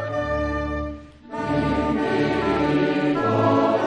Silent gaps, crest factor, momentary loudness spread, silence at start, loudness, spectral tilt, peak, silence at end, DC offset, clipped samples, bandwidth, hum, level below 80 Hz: none; 14 dB; 11 LU; 0 s; -22 LUFS; -7.5 dB/octave; -8 dBFS; 0 s; under 0.1%; under 0.1%; 9.2 kHz; none; -40 dBFS